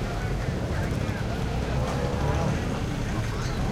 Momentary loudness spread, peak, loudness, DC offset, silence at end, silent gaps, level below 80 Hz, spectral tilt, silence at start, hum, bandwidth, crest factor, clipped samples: 3 LU; -12 dBFS; -28 LUFS; under 0.1%; 0 s; none; -34 dBFS; -6.5 dB/octave; 0 s; none; 15.5 kHz; 14 dB; under 0.1%